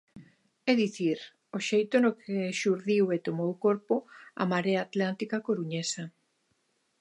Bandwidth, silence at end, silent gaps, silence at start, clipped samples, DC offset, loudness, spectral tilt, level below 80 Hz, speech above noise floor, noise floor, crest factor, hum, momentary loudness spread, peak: 11.5 kHz; 0.9 s; none; 0.15 s; under 0.1%; under 0.1%; -29 LUFS; -5.5 dB/octave; -80 dBFS; 46 dB; -74 dBFS; 20 dB; none; 8 LU; -10 dBFS